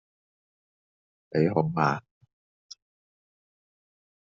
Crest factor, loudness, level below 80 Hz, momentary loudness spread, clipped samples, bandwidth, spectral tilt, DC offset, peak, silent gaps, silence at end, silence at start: 24 dB; -27 LUFS; -70 dBFS; 8 LU; under 0.1%; 7.2 kHz; -6.5 dB/octave; under 0.1%; -8 dBFS; none; 2.2 s; 1.35 s